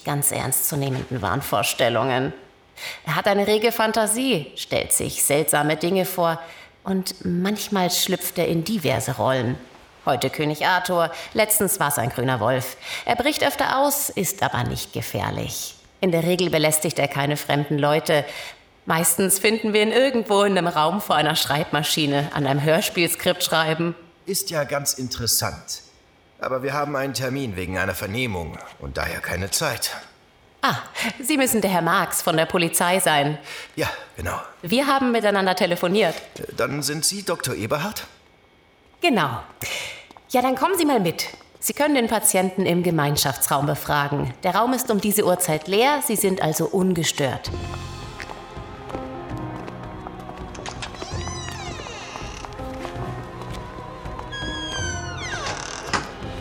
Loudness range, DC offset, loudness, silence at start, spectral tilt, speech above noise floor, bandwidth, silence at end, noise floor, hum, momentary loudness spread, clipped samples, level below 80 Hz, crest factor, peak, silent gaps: 10 LU; under 0.1%; -22 LUFS; 0 s; -3.5 dB/octave; 33 dB; over 20 kHz; 0 s; -55 dBFS; none; 14 LU; under 0.1%; -48 dBFS; 18 dB; -4 dBFS; none